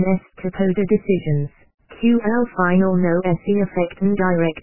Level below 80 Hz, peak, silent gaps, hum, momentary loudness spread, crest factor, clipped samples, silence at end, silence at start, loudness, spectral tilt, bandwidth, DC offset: -48 dBFS; -4 dBFS; 1.74-1.78 s; none; 6 LU; 16 dB; under 0.1%; 0 s; 0 s; -19 LUFS; -12.5 dB/octave; 3.1 kHz; 2%